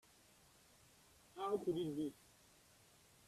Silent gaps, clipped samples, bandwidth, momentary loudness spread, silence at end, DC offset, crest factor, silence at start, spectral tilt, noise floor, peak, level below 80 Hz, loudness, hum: none; under 0.1%; 14.5 kHz; 26 LU; 1.15 s; under 0.1%; 20 dB; 1.35 s; -6.5 dB/octave; -69 dBFS; -28 dBFS; -78 dBFS; -43 LUFS; none